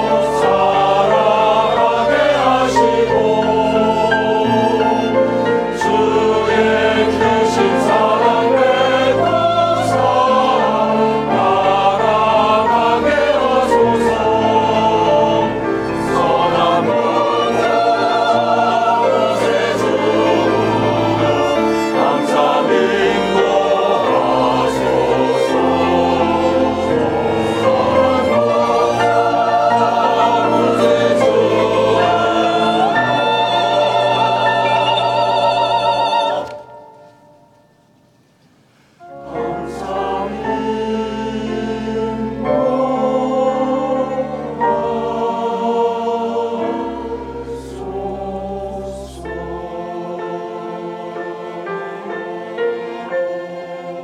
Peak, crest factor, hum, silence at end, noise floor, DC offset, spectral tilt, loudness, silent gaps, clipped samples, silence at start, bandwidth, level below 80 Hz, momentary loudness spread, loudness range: -2 dBFS; 14 dB; none; 0 s; -53 dBFS; under 0.1%; -5.5 dB/octave; -15 LUFS; none; under 0.1%; 0 s; 13.5 kHz; -44 dBFS; 12 LU; 11 LU